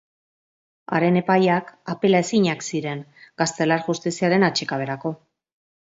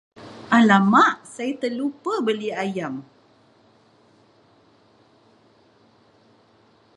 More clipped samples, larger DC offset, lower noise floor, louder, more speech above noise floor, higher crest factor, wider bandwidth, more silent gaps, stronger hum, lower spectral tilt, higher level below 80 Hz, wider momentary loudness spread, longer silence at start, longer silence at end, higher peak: neither; neither; first, under -90 dBFS vs -57 dBFS; about the same, -21 LUFS vs -20 LUFS; first, over 69 dB vs 37 dB; about the same, 18 dB vs 22 dB; second, 8 kHz vs 11 kHz; neither; neither; about the same, -5 dB/octave vs -5.5 dB/octave; first, -66 dBFS vs -72 dBFS; second, 12 LU vs 18 LU; first, 0.9 s vs 0.2 s; second, 0.8 s vs 3.95 s; about the same, -4 dBFS vs -2 dBFS